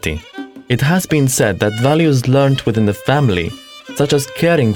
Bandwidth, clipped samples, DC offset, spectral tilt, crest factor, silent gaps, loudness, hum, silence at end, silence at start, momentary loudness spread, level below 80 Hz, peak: 19 kHz; under 0.1%; under 0.1%; -5.5 dB/octave; 14 dB; none; -15 LUFS; none; 0 s; 0.05 s; 14 LU; -40 dBFS; 0 dBFS